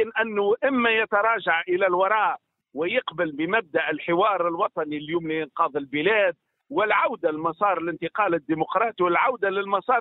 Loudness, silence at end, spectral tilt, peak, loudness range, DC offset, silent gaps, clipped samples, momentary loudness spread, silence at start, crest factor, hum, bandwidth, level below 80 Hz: -23 LUFS; 0 s; -9 dB/octave; -6 dBFS; 2 LU; under 0.1%; none; under 0.1%; 7 LU; 0 s; 16 dB; none; 4.1 kHz; -68 dBFS